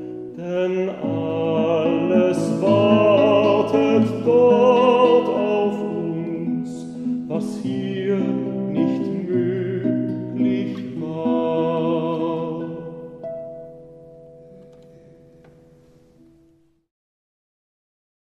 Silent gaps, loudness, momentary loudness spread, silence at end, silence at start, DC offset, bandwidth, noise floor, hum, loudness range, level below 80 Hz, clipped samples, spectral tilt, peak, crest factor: none; -20 LUFS; 15 LU; 3.75 s; 0 s; under 0.1%; 10.5 kHz; -58 dBFS; none; 13 LU; -62 dBFS; under 0.1%; -7.5 dB/octave; -2 dBFS; 18 dB